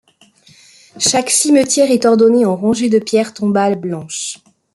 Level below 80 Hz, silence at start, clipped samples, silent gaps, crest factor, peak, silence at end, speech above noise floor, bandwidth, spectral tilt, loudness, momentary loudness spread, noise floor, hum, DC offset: -60 dBFS; 0.95 s; under 0.1%; none; 14 dB; 0 dBFS; 0.4 s; 36 dB; 12.5 kHz; -3.5 dB/octave; -13 LUFS; 12 LU; -49 dBFS; none; under 0.1%